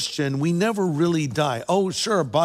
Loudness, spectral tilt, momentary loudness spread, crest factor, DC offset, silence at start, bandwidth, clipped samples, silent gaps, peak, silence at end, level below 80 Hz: -22 LUFS; -5 dB/octave; 2 LU; 16 dB; under 0.1%; 0 s; 15.5 kHz; under 0.1%; none; -6 dBFS; 0 s; -62 dBFS